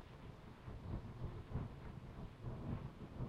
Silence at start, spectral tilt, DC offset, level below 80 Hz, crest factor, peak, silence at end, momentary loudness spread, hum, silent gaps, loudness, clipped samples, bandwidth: 0 s; -8.5 dB/octave; under 0.1%; -54 dBFS; 18 dB; -32 dBFS; 0 s; 9 LU; none; none; -51 LUFS; under 0.1%; 12 kHz